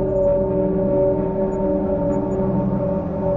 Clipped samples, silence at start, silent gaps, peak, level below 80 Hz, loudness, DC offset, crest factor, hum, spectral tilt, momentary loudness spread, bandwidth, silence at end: under 0.1%; 0 s; none; -8 dBFS; -34 dBFS; -20 LUFS; under 0.1%; 12 dB; none; -11.5 dB/octave; 3 LU; 7.4 kHz; 0 s